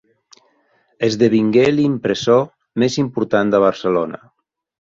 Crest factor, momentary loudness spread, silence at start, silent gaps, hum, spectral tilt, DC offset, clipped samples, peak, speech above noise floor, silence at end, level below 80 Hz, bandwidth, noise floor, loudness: 16 dB; 8 LU; 1 s; none; none; -6 dB/octave; under 0.1%; under 0.1%; -2 dBFS; 45 dB; 0.7 s; -56 dBFS; 7.8 kHz; -60 dBFS; -17 LUFS